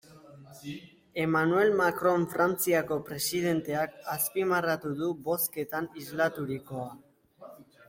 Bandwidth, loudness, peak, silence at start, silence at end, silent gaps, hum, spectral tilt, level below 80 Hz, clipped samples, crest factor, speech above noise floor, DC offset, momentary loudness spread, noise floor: 16.5 kHz; -29 LUFS; -14 dBFS; 0.1 s; 0.25 s; none; none; -4.5 dB/octave; -68 dBFS; under 0.1%; 16 dB; 23 dB; under 0.1%; 14 LU; -52 dBFS